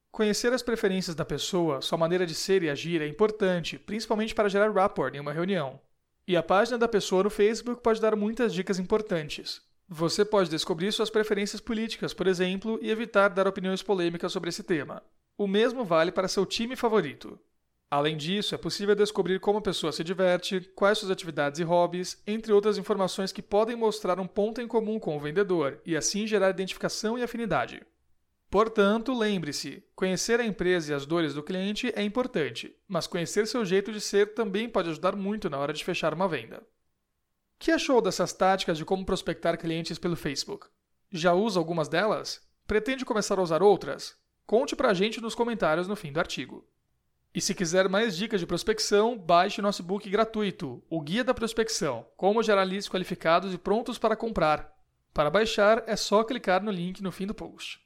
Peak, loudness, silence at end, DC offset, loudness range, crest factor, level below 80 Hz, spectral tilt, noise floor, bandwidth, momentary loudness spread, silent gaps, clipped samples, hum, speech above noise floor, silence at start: -10 dBFS; -27 LUFS; 0.1 s; under 0.1%; 3 LU; 18 dB; -56 dBFS; -4.5 dB/octave; -78 dBFS; 16 kHz; 9 LU; none; under 0.1%; none; 51 dB; 0.15 s